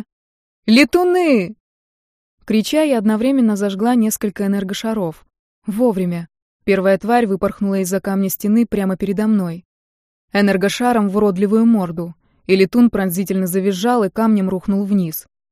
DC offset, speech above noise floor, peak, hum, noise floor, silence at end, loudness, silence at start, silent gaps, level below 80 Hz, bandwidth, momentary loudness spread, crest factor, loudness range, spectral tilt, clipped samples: under 0.1%; over 74 dB; 0 dBFS; none; under -90 dBFS; 0.3 s; -17 LUFS; 0.65 s; 1.60-2.38 s, 5.39-5.62 s, 6.42-6.60 s, 9.65-10.28 s; -50 dBFS; 15.5 kHz; 11 LU; 16 dB; 3 LU; -6 dB/octave; under 0.1%